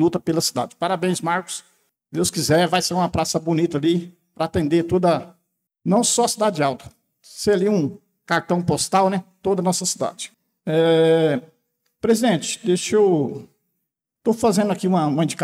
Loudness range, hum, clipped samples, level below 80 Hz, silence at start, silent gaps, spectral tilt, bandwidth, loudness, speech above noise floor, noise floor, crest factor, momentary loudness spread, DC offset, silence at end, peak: 2 LU; none; under 0.1%; -56 dBFS; 0 s; none; -4.5 dB/octave; 16 kHz; -20 LUFS; 59 dB; -78 dBFS; 14 dB; 10 LU; under 0.1%; 0 s; -8 dBFS